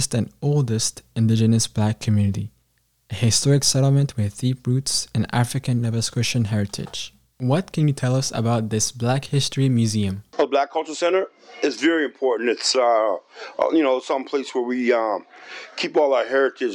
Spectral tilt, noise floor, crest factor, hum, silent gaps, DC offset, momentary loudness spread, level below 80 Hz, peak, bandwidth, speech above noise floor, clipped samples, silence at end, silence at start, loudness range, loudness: -5 dB/octave; -66 dBFS; 16 dB; none; none; under 0.1%; 9 LU; -54 dBFS; -4 dBFS; 16.5 kHz; 45 dB; under 0.1%; 0 s; 0 s; 2 LU; -21 LUFS